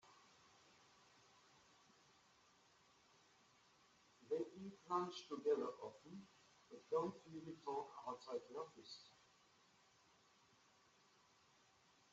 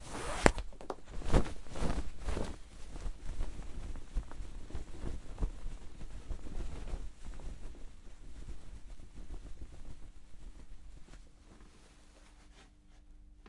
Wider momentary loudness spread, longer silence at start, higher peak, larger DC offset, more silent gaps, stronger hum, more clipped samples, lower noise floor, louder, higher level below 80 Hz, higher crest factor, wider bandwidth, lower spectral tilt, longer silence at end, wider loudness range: about the same, 24 LU vs 26 LU; about the same, 0.05 s vs 0 s; second, -30 dBFS vs 0 dBFS; neither; neither; neither; neither; first, -74 dBFS vs -58 dBFS; second, -48 LUFS vs -41 LUFS; second, under -90 dBFS vs -42 dBFS; second, 22 dB vs 36 dB; second, 8 kHz vs 11.5 kHz; about the same, -4.5 dB/octave vs -5 dB/octave; first, 3 s vs 0 s; second, 11 LU vs 16 LU